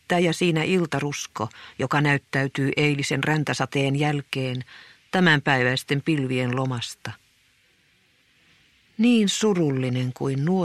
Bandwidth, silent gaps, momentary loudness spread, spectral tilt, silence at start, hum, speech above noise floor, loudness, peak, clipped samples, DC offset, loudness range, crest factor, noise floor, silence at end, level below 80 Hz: 14 kHz; none; 12 LU; -5.5 dB/octave; 0.1 s; none; 39 dB; -23 LUFS; -4 dBFS; under 0.1%; under 0.1%; 4 LU; 20 dB; -62 dBFS; 0 s; -62 dBFS